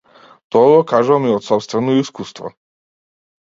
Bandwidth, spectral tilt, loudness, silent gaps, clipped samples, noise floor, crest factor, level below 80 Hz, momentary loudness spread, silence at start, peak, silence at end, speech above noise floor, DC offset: 7.6 kHz; -6.5 dB/octave; -15 LUFS; none; under 0.1%; under -90 dBFS; 16 dB; -62 dBFS; 18 LU; 0.55 s; 0 dBFS; 0.9 s; over 76 dB; under 0.1%